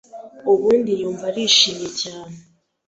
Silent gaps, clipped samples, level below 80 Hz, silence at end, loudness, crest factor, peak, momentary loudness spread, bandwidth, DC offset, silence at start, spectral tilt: none; under 0.1%; -62 dBFS; 0.5 s; -18 LUFS; 20 dB; 0 dBFS; 14 LU; 8 kHz; under 0.1%; 0.15 s; -2.5 dB/octave